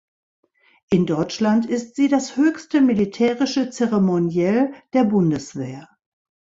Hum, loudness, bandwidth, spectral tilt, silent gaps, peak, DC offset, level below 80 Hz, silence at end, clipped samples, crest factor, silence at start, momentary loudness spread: none; -20 LUFS; 7.8 kHz; -6.5 dB/octave; none; -6 dBFS; under 0.1%; -58 dBFS; 0.65 s; under 0.1%; 14 dB; 0.9 s; 7 LU